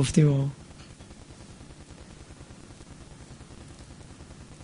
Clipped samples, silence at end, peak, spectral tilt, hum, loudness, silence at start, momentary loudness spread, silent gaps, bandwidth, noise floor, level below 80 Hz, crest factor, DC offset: under 0.1%; 0 s; -8 dBFS; -6.5 dB/octave; none; -24 LUFS; 0 s; 24 LU; none; 10.5 kHz; -47 dBFS; -50 dBFS; 24 dB; under 0.1%